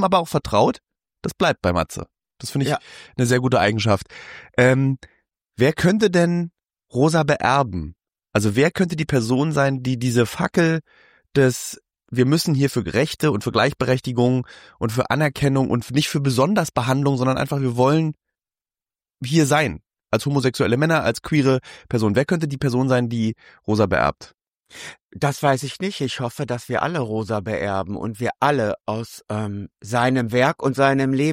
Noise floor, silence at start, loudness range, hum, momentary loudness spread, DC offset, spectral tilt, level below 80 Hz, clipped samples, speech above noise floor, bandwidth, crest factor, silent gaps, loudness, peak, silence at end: under -90 dBFS; 0 s; 4 LU; none; 11 LU; under 0.1%; -6 dB/octave; -48 dBFS; under 0.1%; over 70 dB; 16 kHz; 16 dB; 25.03-25.09 s; -20 LUFS; -4 dBFS; 0 s